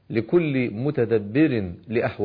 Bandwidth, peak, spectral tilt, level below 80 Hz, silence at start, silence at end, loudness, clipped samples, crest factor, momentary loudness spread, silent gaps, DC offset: 5 kHz; -8 dBFS; -11 dB/octave; -56 dBFS; 0.1 s; 0 s; -23 LUFS; under 0.1%; 14 dB; 5 LU; none; under 0.1%